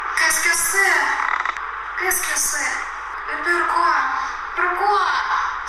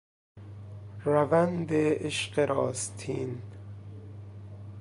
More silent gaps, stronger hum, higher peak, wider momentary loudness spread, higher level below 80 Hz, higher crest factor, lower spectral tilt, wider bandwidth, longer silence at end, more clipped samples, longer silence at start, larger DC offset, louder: neither; neither; first, -6 dBFS vs -10 dBFS; second, 10 LU vs 20 LU; first, -50 dBFS vs -58 dBFS; second, 14 dB vs 20 dB; second, 0.5 dB/octave vs -5.5 dB/octave; first, 16 kHz vs 11.5 kHz; about the same, 0 s vs 0 s; neither; second, 0 s vs 0.35 s; neither; first, -19 LUFS vs -28 LUFS